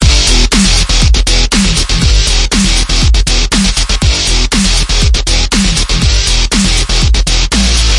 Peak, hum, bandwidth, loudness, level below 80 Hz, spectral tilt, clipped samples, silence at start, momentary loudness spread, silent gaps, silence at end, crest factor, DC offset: 0 dBFS; none; 11.5 kHz; -9 LUFS; -10 dBFS; -3 dB/octave; 0.2%; 0 s; 3 LU; none; 0 s; 8 dB; under 0.1%